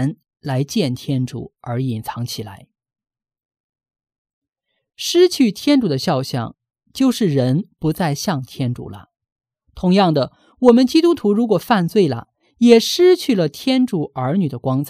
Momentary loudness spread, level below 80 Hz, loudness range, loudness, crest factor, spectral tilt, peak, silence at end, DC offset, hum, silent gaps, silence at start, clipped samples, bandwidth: 14 LU; -54 dBFS; 12 LU; -17 LUFS; 18 dB; -6 dB/octave; 0 dBFS; 0 s; under 0.1%; none; 3.45-3.49 s, 3.60-3.73 s, 4.18-4.25 s, 4.33-4.42 s, 9.32-9.36 s; 0 s; under 0.1%; 15.5 kHz